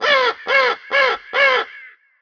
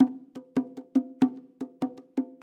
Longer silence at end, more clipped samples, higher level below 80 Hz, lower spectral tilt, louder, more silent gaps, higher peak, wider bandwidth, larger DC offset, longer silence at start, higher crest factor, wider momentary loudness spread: first, 0.35 s vs 0.15 s; neither; first, -66 dBFS vs -76 dBFS; second, -1 dB/octave vs -7.5 dB/octave; first, -16 LUFS vs -30 LUFS; neither; first, -2 dBFS vs -8 dBFS; second, 5.4 kHz vs 6.8 kHz; neither; about the same, 0 s vs 0 s; about the same, 16 dB vs 20 dB; second, 4 LU vs 15 LU